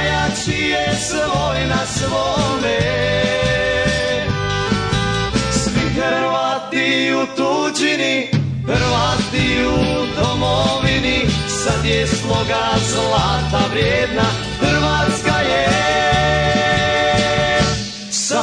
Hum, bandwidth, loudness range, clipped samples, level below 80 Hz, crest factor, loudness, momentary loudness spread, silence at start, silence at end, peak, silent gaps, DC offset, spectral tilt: none; 10 kHz; 2 LU; under 0.1%; -32 dBFS; 14 dB; -17 LUFS; 4 LU; 0 s; 0 s; -4 dBFS; none; under 0.1%; -4 dB/octave